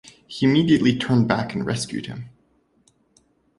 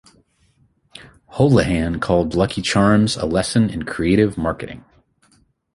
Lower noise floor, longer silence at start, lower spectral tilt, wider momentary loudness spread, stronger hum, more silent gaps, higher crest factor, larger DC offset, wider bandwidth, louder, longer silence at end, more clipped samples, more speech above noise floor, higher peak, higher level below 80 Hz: first, -63 dBFS vs -59 dBFS; second, 0.3 s vs 0.95 s; about the same, -6 dB/octave vs -6 dB/octave; first, 18 LU vs 11 LU; neither; neither; about the same, 20 dB vs 18 dB; neither; about the same, 11.5 kHz vs 11.5 kHz; second, -21 LUFS vs -18 LUFS; first, 1.3 s vs 0.95 s; neither; about the same, 43 dB vs 42 dB; about the same, -2 dBFS vs -2 dBFS; second, -54 dBFS vs -38 dBFS